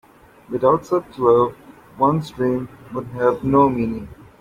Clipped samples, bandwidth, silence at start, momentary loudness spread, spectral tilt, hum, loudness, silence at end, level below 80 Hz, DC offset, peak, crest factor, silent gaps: under 0.1%; 15 kHz; 0.5 s; 14 LU; -8.5 dB/octave; none; -19 LUFS; 0.25 s; -48 dBFS; under 0.1%; -2 dBFS; 18 dB; none